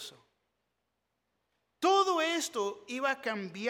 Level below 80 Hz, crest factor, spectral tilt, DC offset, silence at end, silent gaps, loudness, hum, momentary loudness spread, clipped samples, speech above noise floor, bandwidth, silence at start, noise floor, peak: -84 dBFS; 20 dB; -2.5 dB/octave; under 0.1%; 0 s; none; -31 LUFS; none; 10 LU; under 0.1%; 48 dB; 17.5 kHz; 0 s; -83 dBFS; -14 dBFS